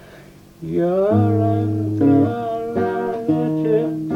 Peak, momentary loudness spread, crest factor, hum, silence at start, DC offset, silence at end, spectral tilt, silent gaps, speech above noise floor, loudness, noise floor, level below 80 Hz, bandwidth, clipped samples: -6 dBFS; 7 LU; 14 dB; none; 0.05 s; under 0.1%; 0 s; -10 dB/octave; none; 26 dB; -19 LUFS; -43 dBFS; -54 dBFS; 6.8 kHz; under 0.1%